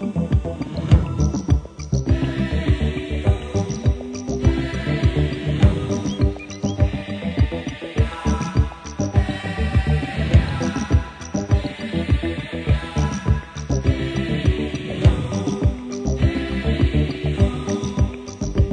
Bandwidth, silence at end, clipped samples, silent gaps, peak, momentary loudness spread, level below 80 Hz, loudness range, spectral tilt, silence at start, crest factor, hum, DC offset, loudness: 9.8 kHz; 0 s; under 0.1%; none; -2 dBFS; 8 LU; -26 dBFS; 2 LU; -7 dB/octave; 0 s; 18 dB; none; under 0.1%; -22 LUFS